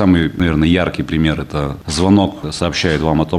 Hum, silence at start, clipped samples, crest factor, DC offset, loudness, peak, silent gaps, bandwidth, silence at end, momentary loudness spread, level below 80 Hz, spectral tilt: none; 0 s; under 0.1%; 14 dB; under 0.1%; -16 LUFS; 0 dBFS; none; 13 kHz; 0 s; 7 LU; -30 dBFS; -6 dB/octave